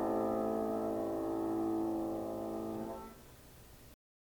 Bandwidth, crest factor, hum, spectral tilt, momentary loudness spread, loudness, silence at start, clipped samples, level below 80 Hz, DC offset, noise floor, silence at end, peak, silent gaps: 19.5 kHz; 14 dB; none; -7.5 dB/octave; 22 LU; -37 LUFS; 0 s; under 0.1%; -62 dBFS; under 0.1%; -57 dBFS; 0.3 s; -24 dBFS; none